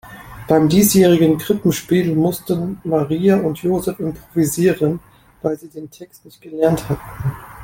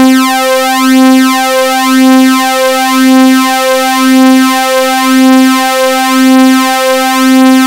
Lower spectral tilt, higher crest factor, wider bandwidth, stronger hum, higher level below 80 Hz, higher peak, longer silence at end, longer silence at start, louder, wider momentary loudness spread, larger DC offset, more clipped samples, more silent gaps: first, -6 dB/octave vs -1.5 dB/octave; first, 16 dB vs 6 dB; about the same, 17 kHz vs 16.5 kHz; neither; first, -46 dBFS vs -56 dBFS; about the same, -2 dBFS vs 0 dBFS; about the same, 0 s vs 0 s; about the same, 0.05 s vs 0 s; second, -17 LUFS vs -6 LUFS; first, 16 LU vs 4 LU; second, under 0.1% vs 0.6%; second, under 0.1% vs 0.7%; neither